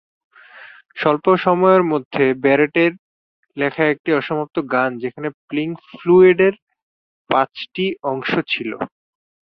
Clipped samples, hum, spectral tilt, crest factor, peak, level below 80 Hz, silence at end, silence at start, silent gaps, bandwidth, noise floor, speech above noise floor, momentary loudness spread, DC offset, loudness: under 0.1%; none; -8.5 dB/octave; 16 dB; -2 dBFS; -62 dBFS; 0.6 s; 0.55 s; 2.05-2.11 s, 2.99-3.43 s, 3.99-4.04 s, 5.34-5.48 s, 6.62-6.67 s, 6.82-7.25 s; 5.4 kHz; -42 dBFS; 25 dB; 13 LU; under 0.1%; -18 LUFS